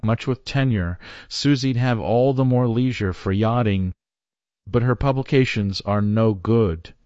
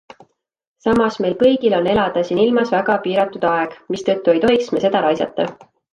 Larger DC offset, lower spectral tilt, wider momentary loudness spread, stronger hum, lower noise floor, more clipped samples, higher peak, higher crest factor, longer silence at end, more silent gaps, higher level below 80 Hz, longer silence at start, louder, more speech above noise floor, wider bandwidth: neither; about the same, -7 dB/octave vs -6 dB/octave; about the same, 6 LU vs 7 LU; neither; first, under -90 dBFS vs -52 dBFS; neither; about the same, -4 dBFS vs -2 dBFS; about the same, 16 dB vs 14 dB; second, 0.15 s vs 0.4 s; neither; first, -44 dBFS vs -50 dBFS; second, 0.05 s vs 0.85 s; second, -21 LUFS vs -17 LUFS; first, over 70 dB vs 35 dB; second, 8 kHz vs 10.5 kHz